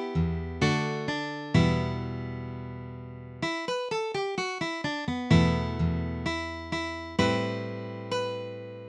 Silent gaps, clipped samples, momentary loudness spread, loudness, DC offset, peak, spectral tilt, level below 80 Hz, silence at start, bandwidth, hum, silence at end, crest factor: none; under 0.1%; 13 LU; -29 LUFS; under 0.1%; -10 dBFS; -6 dB/octave; -44 dBFS; 0 s; 10 kHz; none; 0 s; 20 dB